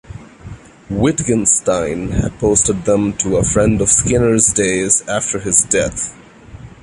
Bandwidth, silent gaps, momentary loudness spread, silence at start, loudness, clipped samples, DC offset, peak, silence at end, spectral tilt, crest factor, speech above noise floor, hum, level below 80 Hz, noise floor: 11.5 kHz; none; 8 LU; 0.1 s; -14 LUFS; under 0.1%; under 0.1%; 0 dBFS; 0.15 s; -4 dB/octave; 16 dB; 22 dB; none; -34 dBFS; -36 dBFS